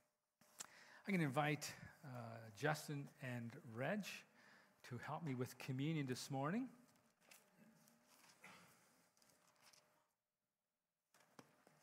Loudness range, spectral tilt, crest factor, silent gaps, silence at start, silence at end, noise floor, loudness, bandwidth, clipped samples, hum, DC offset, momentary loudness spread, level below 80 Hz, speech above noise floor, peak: 14 LU; -5.5 dB/octave; 24 dB; none; 0.6 s; 0.4 s; under -90 dBFS; -47 LUFS; 16 kHz; under 0.1%; none; under 0.1%; 22 LU; -90 dBFS; over 44 dB; -26 dBFS